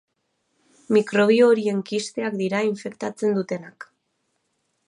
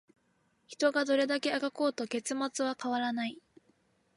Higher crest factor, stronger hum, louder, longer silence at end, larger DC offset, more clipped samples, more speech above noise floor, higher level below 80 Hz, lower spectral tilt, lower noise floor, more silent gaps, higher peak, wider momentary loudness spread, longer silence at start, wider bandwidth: about the same, 16 dB vs 18 dB; neither; first, -22 LUFS vs -32 LUFS; first, 1.05 s vs 0.75 s; neither; neither; first, 52 dB vs 41 dB; first, -76 dBFS vs -84 dBFS; first, -5.5 dB/octave vs -2.5 dB/octave; about the same, -73 dBFS vs -73 dBFS; neither; first, -6 dBFS vs -16 dBFS; first, 14 LU vs 7 LU; first, 0.9 s vs 0.7 s; about the same, 11 kHz vs 11.5 kHz